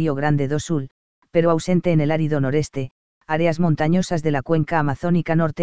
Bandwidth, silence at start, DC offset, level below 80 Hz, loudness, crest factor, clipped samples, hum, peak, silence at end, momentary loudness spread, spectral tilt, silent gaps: 8 kHz; 0 s; 2%; -48 dBFS; -21 LUFS; 16 dB; under 0.1%; none; -4 dBFS; 0 s; 7 LU; -7 dB/octave; 0.91-1.22 s, 2.91-3.21 s